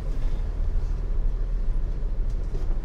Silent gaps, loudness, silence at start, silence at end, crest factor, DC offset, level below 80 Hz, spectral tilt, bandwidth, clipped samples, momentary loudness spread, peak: none; -32 LUFS; 0 s; 0 s; 10 dB; under 0.1%; -24 dBFS; -8 dB/octave; 3.8 kHz; under 0.1%; 1 LU; -14 dBFS